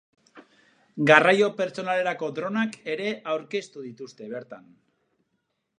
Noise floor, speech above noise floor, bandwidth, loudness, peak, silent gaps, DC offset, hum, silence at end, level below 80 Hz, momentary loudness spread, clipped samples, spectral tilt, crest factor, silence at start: -77 dBFS; 52 dB; 10.5 kHz; -23 LUFS; -2 dBFS; none; under 0.1%; none; 1.2 s; -80 dBFS; 23 LU; under 0.1%; -5 dB/octave; 26 dB; 0.35 s